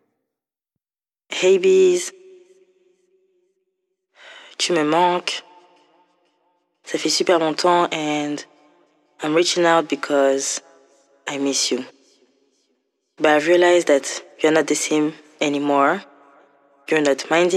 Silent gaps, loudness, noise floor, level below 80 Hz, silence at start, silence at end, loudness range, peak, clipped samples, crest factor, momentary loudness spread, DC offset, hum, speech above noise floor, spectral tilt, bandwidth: none; -19 LUFS; under -90 dBFS; -84 dBFS; 1.3 s; 0 s; 5 LU; -4 dBFS; under 0.1%; 18 dB; 14 LU; under 0.1%; none; over 72 dB; -3 dB/octave; 13 kHz